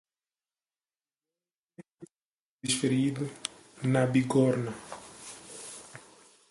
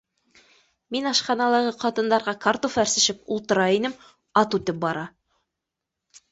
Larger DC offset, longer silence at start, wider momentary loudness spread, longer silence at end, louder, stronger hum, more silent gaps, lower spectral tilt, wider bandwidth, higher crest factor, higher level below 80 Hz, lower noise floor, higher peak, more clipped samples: neither; first, 1.8 s vs 0.9 s; first, 19 LU vs 9 LU; second, 0.5 s vs 1.25 s; second, -29 LUFS vs -23 LUFS; neither; first, 1.94-1.98 s, 2.25-2.59 s vs none; first, -5.5 dB/octave vs -3 dB/octave; first, 11.5 kHz vs 8.2 kHz; about the same, 20 dB vs 20 dB; about the same, -68 dBFS vs -64 dBFS; first, under -90 dBFS vs -84 dBFS; second, -12 dBFS vs -4 dBFS; neither